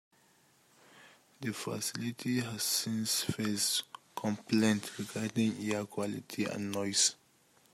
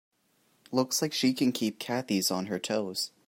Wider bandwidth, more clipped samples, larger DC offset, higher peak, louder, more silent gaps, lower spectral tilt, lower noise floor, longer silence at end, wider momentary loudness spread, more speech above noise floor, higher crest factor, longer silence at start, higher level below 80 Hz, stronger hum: about the same, 16 kHz vs 16 kHz; neither; neither; about the same, -14 dBFS vs -12 dBFS; second, -33 LUFS vs -29 LUFS; neither; about the same, -3 dB/octave vs -3.5 dB/octave; about the same, -67 dBFS vs -70 dBFS; first, 0.6 s vs 0.2 s; first, 9 LU vs 6 LU; second, 33 dB vs 40 dB; about the same, 22 dB vs 18 dB; first, 0.95 s vs 0.7 s; about the same, -74 dBFS vs -78 dBFS; neither